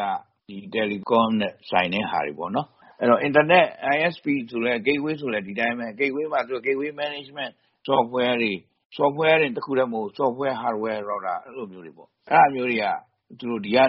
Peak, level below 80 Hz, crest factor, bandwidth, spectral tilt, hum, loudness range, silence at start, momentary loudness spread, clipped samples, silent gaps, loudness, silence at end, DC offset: -2 dBFS; -66 dBFS; 20 dB; 5.8 kHz; -3 dB/octave; none; 4 LU; 0 s; 14 LU; under 0.1%; 8.85-8.90 s; -23 LUFS; 0 s; under 0.1%